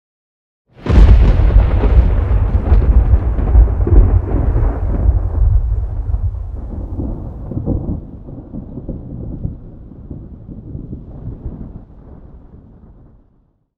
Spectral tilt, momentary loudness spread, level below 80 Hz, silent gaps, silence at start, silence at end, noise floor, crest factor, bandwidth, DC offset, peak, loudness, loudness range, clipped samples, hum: -10 dB/octave; 20 LU; -16 dBFS; none; 0.8 s; 1.4 s; -56 dBFS; 14 dB; 4.2 kHz; under 0.1%; 0 dBFS; -16 LUFS; 19 LU; 0.3%; none